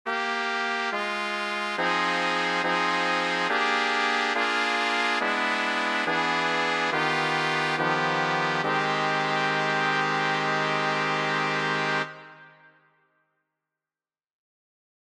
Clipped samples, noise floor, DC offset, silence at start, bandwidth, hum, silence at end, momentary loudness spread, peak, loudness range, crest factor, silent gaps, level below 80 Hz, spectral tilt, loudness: under 0.1%; under -90 dBFS; under 0.1%; 0.05 s; 13.5 kHz; none; 2.55 s; 3 LU; -8 dBFS; 5 LU; 18 dB; none; -80 dBFS; -3.5 dB/octave; -25 LUFS